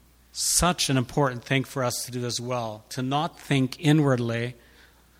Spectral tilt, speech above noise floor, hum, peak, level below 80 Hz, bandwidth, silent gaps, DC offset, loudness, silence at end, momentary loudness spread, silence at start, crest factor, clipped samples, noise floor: -4 dB/octave; 30 dB; none; -8 dBFS; -48 dBFS; 16.5 kHz; none; under 0.1%; -25 LUFS; 0.65 s; 10 LU; 0.35 s; 18 dB; under 0.1%; -55 dBFS